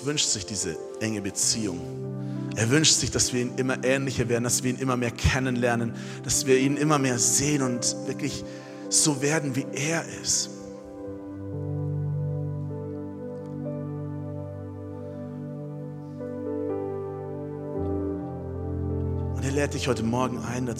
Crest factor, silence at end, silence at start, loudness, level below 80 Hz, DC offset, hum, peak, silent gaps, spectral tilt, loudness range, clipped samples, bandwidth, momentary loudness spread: 22 dB; 0 s; 0 s; -26 LUFS; -48 dBFS; under 0.1%; none; -6 dBFS; none; -3.5 dB/octave; 11 LU; under 0.1%; 16 kHz; 15 LU